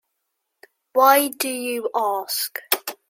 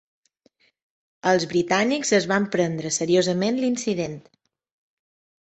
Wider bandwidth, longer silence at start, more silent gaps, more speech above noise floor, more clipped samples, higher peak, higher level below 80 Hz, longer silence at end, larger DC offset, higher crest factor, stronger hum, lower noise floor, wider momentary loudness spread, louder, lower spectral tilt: first, 16.5 kHz vs 8.4 kHz; second, 0.95 s vs 1.25 s; neither; first, 57 dB vs 42 dB; neither; first, 0 dBFS vs -4 dBFS; second, -78 dBFS vs -64 dBFS; second, 0.15 s vs 1.25 s; neither; about the same, 22 dB vs 20 dB; neither; first, -77 dBFS vs -64 dBFS; first, 10 LU vs 7 LU; about the same, -21 LUFS vs -22 LUFS; second, 0 dB/octave vs -4 dB/octave